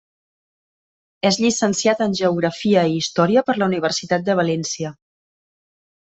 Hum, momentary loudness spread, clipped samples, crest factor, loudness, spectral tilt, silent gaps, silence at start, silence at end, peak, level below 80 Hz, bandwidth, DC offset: none; 5 LU; under 0.1%; 18 dB; -19 LUFS; -4.5 dB/octave; none; 1.25 s; 1.1 s; -4 dBFS; -60 dBFS; 8.4 kHz; under 0.1%